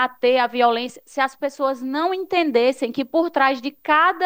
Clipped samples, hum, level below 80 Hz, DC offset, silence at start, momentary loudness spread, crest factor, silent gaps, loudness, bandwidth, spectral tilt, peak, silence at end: under 0.1%; none; -70 dBFS; under 0.1%; 0 s; 7 LU; 16 dB; none; -20 LUFS; 16.5 kHz; -3.5 dB/octave; -4 dBFS; 0 s